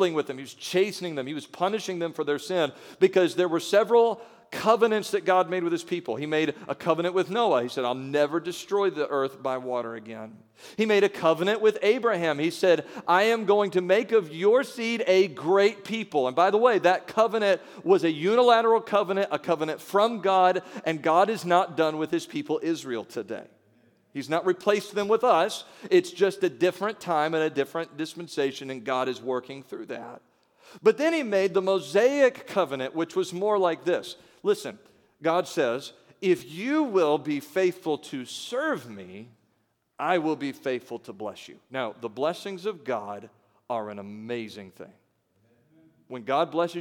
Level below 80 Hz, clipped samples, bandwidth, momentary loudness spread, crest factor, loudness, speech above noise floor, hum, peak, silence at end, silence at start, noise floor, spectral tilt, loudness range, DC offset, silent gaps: -80 dBFS; under 0.1%; 18 kHz; 14 LU; 20 dB; -25 LUFS; 47 dB; none; -6 dBFS; 0 s; 0 s; -72 dBFS; -5 dB/octave; 9 LU; under 0.1%; none